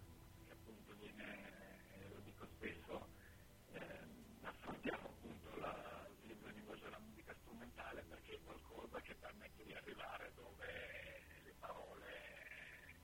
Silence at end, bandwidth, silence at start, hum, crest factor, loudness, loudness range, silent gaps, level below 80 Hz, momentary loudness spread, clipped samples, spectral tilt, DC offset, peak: 0 s; 16.5 kHz; 0 s; none; 24 dB; -55 LUFS; 3 LU; none; -68 dBFS; 10 LU; under 0.1%; -5 dB/octave; under 0.1%; -32 dBFS